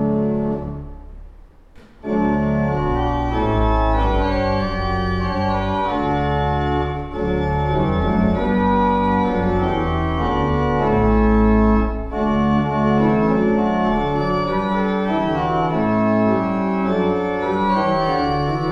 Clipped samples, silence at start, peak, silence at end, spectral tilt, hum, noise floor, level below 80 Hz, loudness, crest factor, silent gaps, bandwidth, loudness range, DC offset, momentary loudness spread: under 0.1%; 0 s; -4 dBFS; 0 s; -8.5 dB/octave; none; -44 dBFS; -28 dBFS; -19 LUFS; 14 dB; none; 7 kHz; 3 LU; under 0.1%; 5 LU